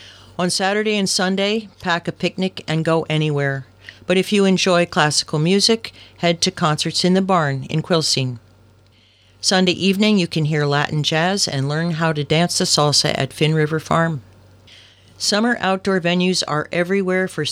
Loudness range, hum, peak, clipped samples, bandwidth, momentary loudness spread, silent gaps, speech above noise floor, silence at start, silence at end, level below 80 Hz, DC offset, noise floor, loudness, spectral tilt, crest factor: 3 LU; none; -2 dBFS; under 0.1%; 15.5 kHz; 7 LU; none; 35 dB; 0 s; 0 s; -56 dBFS; under 0.1%; -53 dBFS; -18 LUFS; -4 dB/octave; 18 dB